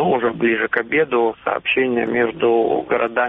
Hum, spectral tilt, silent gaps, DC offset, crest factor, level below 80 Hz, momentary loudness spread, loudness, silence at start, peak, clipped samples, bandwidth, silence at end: none; -3 dB/octave; none; under 0.1%; 14 dB; -56 dBFS; 3 LU; -18 LUFS; 0 s; -4 dBFS; under 0.1%; 3.9 kHz; 0 s